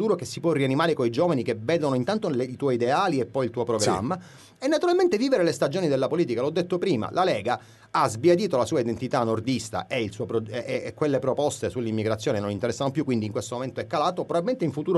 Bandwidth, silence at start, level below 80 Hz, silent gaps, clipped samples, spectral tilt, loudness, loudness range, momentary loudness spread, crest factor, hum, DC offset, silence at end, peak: 12 kHz; 0 s; -62 dBFS; none; under 0.1%; -5.5 dB/octave; -25 LUFS; 3 LU; 7 LU; 16 dB; none; under 0.1%; 0 s; -8 dBFS